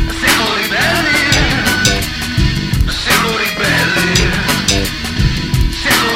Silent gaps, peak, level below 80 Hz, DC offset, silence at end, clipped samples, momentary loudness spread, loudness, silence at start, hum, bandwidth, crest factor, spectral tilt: none; 0 dBFS; -22 dBFS; under 0.1%; 0 s; under 0.1%; 5 LU; -13 LUFS; 0 s; none; 17 kHz; 14 dB; -3.5 dB/octave